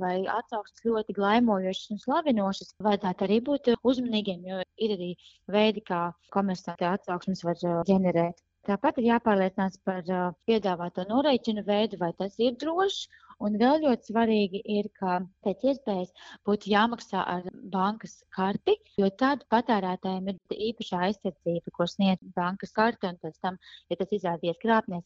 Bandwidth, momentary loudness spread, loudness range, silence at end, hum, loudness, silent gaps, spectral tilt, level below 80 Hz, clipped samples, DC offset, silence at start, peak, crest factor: 7.6 kHz; 9 LU; 3 LU; 0.05 s; none; -28 LUFS; none; -6.5 dB/octave; -64 dBFS; under 0.1%; under 0.1%; 0 s; -8 dBFS; 18 dB